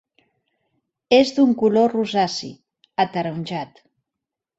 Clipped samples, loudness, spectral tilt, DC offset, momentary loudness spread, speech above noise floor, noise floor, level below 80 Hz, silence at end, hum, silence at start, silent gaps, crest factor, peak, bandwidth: under 0.1%; -20 LUFS; -5.5 dB/octave; under 0.1%; 14 LU; 66 dB; -85 dBFS; -64 dBFS; 0.9 s; none; 1.1 s; none; 20 dB; -2 dBFS; 8 kHz